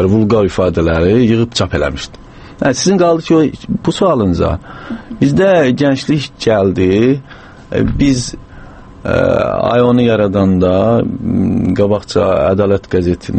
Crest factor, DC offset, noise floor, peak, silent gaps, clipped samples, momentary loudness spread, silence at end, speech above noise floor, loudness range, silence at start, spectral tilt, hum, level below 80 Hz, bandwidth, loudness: 12 dB; under 0.1%; -34 dBFS; 0 dBFS; none; under 0.1%; 8 LU; 0 s; 22 dB; 2 LU; 0 s; -6.5 dB/octave; none; -32 dBFS; 8.8 kHz; -13 LUFS